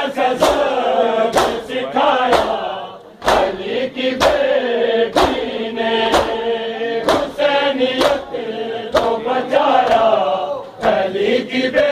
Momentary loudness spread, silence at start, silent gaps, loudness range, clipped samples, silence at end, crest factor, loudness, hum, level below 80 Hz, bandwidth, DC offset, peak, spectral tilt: 8 LU; 0 s; none; 1 LU; under 0.1%; 0 s; 16 dB; -17 LUFS; none; -42 dBFS; 15.5 kHz; under 0.1%; 0 dBFS; -4 dB/octave